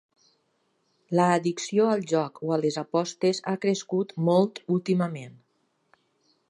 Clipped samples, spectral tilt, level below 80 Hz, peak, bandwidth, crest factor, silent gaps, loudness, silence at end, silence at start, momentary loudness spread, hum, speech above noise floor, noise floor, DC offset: under 0.1%; -6 dB/octave; -76 dBFS; -8 dBFS; 11 kHz; 20 dB; none; -26 LUFS; 1.2 s; 1.1 s; 6 LU; none; 47 dB; -72 dBFS; under 0.1%